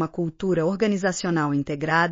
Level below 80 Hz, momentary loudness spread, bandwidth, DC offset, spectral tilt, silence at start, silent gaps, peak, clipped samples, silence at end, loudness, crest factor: -54 dBFS; 4 LU; 7.4 kHz; under 0.1%; -5 dB/octave; 0 s; none; -8 dBFS; under 0.1%; 0 s; -24 LUFS; 16 dB